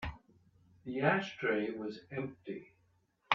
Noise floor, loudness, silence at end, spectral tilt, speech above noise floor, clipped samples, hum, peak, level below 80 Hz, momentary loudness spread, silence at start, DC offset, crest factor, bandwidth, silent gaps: -74 dBFS; -36 LUFS; 0 s; -6.5 dB/octave; 38 dB; under 0.1%; none; -10 dBFS; -60 dBFS; 15 LU; 0 s; under 0.1%; 28 dB; 7.6 kHz; none